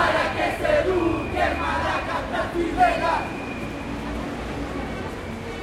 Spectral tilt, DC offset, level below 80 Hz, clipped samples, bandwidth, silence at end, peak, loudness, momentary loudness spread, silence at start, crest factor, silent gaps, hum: -5.5 dB/octave; under 0.1%; -38 dBFS; under 0.1%; 16 kHz; 0 s; -6 dBFS; -24 LUFS; 10 LU; 0 s; 18 dB; none; none